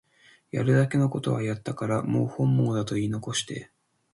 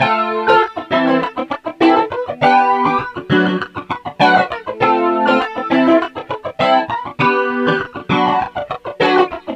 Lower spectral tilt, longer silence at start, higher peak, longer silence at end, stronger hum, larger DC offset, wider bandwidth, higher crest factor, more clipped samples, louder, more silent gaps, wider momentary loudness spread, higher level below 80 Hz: about the same, -6 dB/octave vs -6.5 dB/octave; first, 0.55 s vs 0 s; second, -10 dBFS vs 0 dBFS; first, 0.5 s vs 0 s; neither; neither; first, 11.5 kHz vs 9.6 kHz; about the same, 16 dB vs 14 dB; neither; second, -26 LUFS vs -15 LUFS; neither; about the same, 9 LU vs 10 LU; second, -60 dBFS vs -52 dBFS